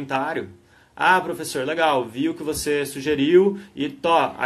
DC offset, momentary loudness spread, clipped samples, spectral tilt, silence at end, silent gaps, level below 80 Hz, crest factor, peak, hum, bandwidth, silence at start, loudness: under 0.1%; 11 LU; under 0.1%; -4.5 dB/octave; 0 s; none; -54 dBFS; 18 dB; -4 dBFS; none; 12.5 kHz; 0 s; -21 LUFS